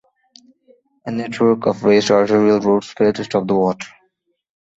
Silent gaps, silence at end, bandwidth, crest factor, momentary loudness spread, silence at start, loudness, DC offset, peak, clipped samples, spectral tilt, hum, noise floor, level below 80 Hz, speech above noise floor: none; 0.9 s; 8 kHz; 16 dB; 13 LU; 1.05 s; -16 LUFS; under 0.1%; -2 dBFS; under 0.1%; -6 dB/octave; none; -66 dBFS; -58 dBFS; 50 dB